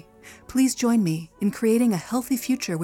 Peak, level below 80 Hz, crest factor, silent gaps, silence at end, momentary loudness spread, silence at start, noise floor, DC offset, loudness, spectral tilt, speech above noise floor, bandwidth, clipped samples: -12 dBFS; -58 dBFS; 12 dB; none; 0 s; 6 LU; 0.25 s; -47 dBFS; under 0.1%; -23 LUFS; -5.5 dB/octave; 24 dB; 18 kHz; under 0.1%